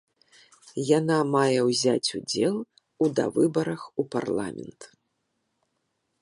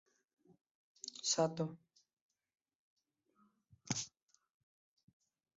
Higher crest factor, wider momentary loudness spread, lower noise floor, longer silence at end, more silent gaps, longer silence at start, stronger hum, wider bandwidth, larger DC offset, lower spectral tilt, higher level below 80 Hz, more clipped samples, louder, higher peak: second, 20 dB vs 26 dB; about the same, 13 LU vs 15 LU; about the same, -77 dBFS vs -77 dBFS; second, 1.35 s vs 1.5 s; second, none vs 2.13-2.30 s, 2.75-2.96 s; second, 0.65 s vs 1.05 s; neither; first, 11.5 kHz vs 7.6 kHz; neither; about the same, -5 dB/octave vs -4 dB/octave; first, -68 dBFS vs -82 dBFS; neither; first, -25 LUFS vs -39 LUFS; first, -8 dBFS vs -20 dBFS